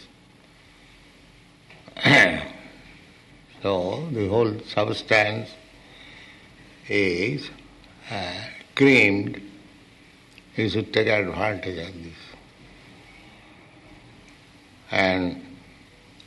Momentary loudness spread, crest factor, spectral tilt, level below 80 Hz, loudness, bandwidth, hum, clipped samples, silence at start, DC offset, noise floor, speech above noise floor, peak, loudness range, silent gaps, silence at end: 25 LU; 22 dB; -5.5 dB/octave; -56 dBFS; -22 LUFS; 12 kHz; none; under 0.1%; 0 s; under 0.1%; -53 dBFS; 30 dB; -4 dBFS; 7 LU; none; 0.7 s